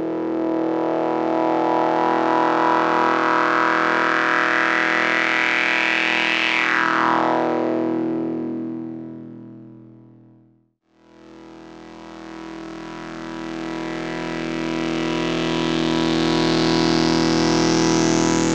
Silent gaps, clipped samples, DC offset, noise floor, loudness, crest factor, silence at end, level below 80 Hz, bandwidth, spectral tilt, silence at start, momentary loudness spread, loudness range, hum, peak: none; under 0.1%; under 0.1%; -60 dBFS; -19 LUFS; 18 dB; 0 s; -46 dBFS; 9.2 kHz; -4 dB/octave; 0 s; 16 LU; 17 LU; none; -4 dBFS